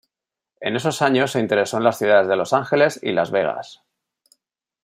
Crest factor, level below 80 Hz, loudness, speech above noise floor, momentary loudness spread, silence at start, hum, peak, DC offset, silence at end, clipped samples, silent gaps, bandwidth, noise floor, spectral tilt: 18 dB; -66 dBFS; -19 LUFS; 68 dB; 9 LU; 0.6 s; none; -2 dBFS; under 0.1%; 1.1 s; under 0.1%; none; 15.5 kHz; -87 dBFS; -5 dB/octave